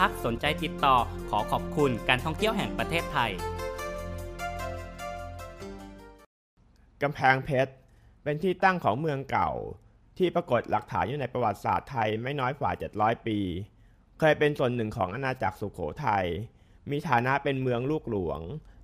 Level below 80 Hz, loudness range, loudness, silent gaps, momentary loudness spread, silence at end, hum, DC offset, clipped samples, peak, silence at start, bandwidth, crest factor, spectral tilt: -48 dBFS; 6 LU; -29 LUFS; 6.26-6.57 s; 14 LU; 0 s; none; under 0.1%; under 0.1%; -6 dBFS; 0 s; 15.5 kHz; 24 dB; -6 dB/octave